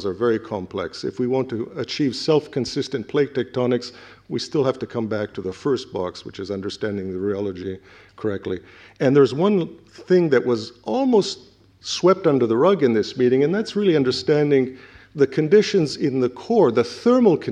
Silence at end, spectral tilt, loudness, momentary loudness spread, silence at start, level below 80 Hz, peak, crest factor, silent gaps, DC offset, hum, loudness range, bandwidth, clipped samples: 0 s; -6 dB/octave; -21 LUFS; 12 LU; 0 s; -60 dBFS; -4 dBFS; 18 dB; none; under 0.1%; none; 7 LU; 9.6 kHz; under 0.1%